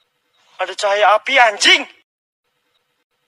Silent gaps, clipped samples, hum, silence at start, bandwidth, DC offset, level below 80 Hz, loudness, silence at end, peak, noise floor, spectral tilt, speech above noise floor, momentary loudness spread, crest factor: none; under 0.1%; none; 0.6 s; 14 kHz; under 0.1%; -74 dBFS; -13 LUFS; 1.4 s; 0 dBFS; -67 dBFS; 1.5 dB/octave; 53 dB; 15 LU; 18 dB